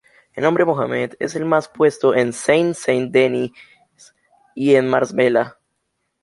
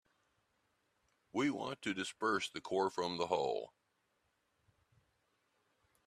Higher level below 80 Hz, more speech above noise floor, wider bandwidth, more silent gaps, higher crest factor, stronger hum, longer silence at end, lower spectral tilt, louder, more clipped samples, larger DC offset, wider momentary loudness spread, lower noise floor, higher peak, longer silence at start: first, -62 dBFS vs -80 dBFS; first, 56 dB vs 43 dB; second, 11.5 kHz vs 13.5 kHz; neither; second, 16 dB vs 22 dB; neither; second, 0.7 s vs 2.4 s; first, -5.5 dB/octave vs -4 dB/octave; first, -18 LUFS vs -38 LUFS; neither; neither; first, 9 LU vs 6 LU; second, -73 dBFS vs -81 dBFS; first, -2 dBFS vs -20 dBFS; second, 0.35 s vs 1.35 s